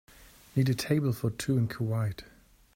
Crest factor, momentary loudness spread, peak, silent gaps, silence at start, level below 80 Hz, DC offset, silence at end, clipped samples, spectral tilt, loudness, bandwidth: 18 dB; 6 LU; -12 dBFS; none; 0.2 s; -58 dBFS; under 0.1%; 0.5 s; under 0.1%; -6.5 dB/octave; -30 LUFS; 16 kHz